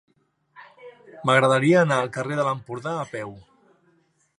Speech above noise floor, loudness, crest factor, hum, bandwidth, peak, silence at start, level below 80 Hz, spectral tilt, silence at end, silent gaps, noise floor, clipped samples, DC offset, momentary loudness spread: 43 dB; -22 LUFS; 22 dB; none; 11 kHz; -4 dBFS; 0.6 s; -68 dBFS; -6 dB/octave; 1 s; none; -64 dBFS; under 0.1%; under 0.1%; 14 LU